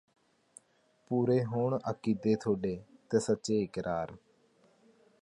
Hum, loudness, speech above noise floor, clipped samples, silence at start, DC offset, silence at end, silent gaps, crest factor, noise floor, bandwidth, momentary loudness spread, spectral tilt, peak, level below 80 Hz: none; -32 LUFS; 38 dB; under 0.1%; 1.1 s; under 0.1%; 1.05 s; none; 18 dB; -69 dBFS; 11.5 kHz; 8 LU; -7 dB/octave; -14 dBFS; -64 dBFS